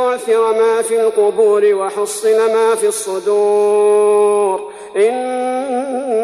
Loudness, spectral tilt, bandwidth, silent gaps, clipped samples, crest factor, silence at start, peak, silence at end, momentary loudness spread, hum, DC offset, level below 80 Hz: -14 LUFS; -3 dB/octave; 13.5 kHz; none; under 0.1%; 10 dB; 0 s; -4 dBFS; 0 s; 7 LU; none; under 0.1%; -64 dBFS